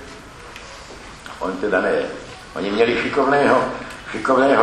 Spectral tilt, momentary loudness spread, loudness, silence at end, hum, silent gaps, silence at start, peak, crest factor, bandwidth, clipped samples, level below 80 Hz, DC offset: -5 dB/octave; 21 LU; -19 LUFS; 0 s; none; none; 0 s; 0 dBFS; 20 dB; 12 kHz; under 0.1%; -48 dBFS; under 0.1%